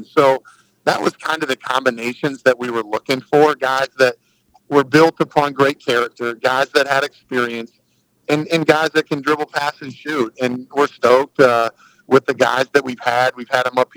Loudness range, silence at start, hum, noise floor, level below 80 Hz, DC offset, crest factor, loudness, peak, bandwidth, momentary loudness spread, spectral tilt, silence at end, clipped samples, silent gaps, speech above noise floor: 3 LU; 0 s; none; -62 dBFS; -64 dBFS; under 0.1%; 18 dB; -17 LUFS; 0 dBFS; over 20 kHz; 9 LU; -4.5 dB/octave; 0.1 s; under 0.1%; none; 45 dB